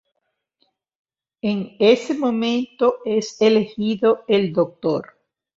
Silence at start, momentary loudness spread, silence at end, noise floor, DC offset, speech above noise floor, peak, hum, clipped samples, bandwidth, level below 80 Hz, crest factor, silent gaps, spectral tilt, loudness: 1.45 s; 8 LU; 0.55 s; -75 dBFS; under 0.1%; 56 dB; -2 dBFS; none; under 0.1%; 7.8 kHz; -64 dBFS; 18 dB; none; -6 dB/octave; -20 LUFS